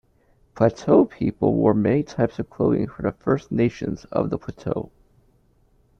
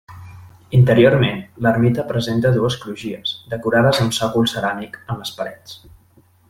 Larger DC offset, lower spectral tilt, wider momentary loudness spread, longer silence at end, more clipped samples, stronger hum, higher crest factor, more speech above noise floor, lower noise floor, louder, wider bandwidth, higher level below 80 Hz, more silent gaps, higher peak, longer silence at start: neither; first, -8.5 dB/octave vs -6 dB/octave; second, 11 LU vs 15 LU; first, 1.15 s vs 0.75 s; neither; neither; about the same, 20 dB vs 16 dB; about the same, 39 dB vs 36 dB; first, -60 dBFS vs -53 dBFS; second, -22 LUFS vs -18 LUFS; second, 7.4 kHz vs 15.5 kHz; about the same, -50 dBFS vs -48 dBFS; neither; about the same, -4 dBFS vs -2 dBFS; first, 0.55 s vs 0.1 s